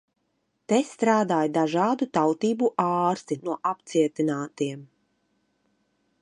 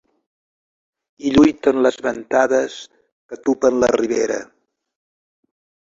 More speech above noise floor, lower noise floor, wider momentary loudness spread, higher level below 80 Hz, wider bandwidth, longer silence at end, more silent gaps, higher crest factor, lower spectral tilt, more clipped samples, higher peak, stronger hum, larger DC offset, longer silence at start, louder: second, 50 dB vs over 73 dB; second, -74 dBFS vs under -90 dBFS; second, 8 LU vs 13 LU; second, -76 dBFS vs -50 dBFS; first, 11 kHz vs 7.8 kHz; about the same, 1.35 s vs 1.4 s; second, none vs 3.12-3.29 s; about the same, 18 dB vs 18 dB; about the same, -6 dB/octave vs -5 dB/octave; neither; second, -6 dBFS vs -2 dBFS; neither; neither; second, 0.7 s vs 1.2 s; second, -25 LUFS vs -18 LUFS